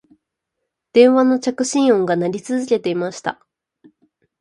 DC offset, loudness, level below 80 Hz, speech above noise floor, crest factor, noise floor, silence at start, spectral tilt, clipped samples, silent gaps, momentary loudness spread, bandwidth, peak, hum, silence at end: under 0.1%; -17 LUFS; -66 dBFS; 62 dB; 18 dB; -78 dBFS; 0.95 s; -5 dB/octave; under 0.1%; none; 11 LU; 11 kHz; 0 dBFS; none; 1.1 s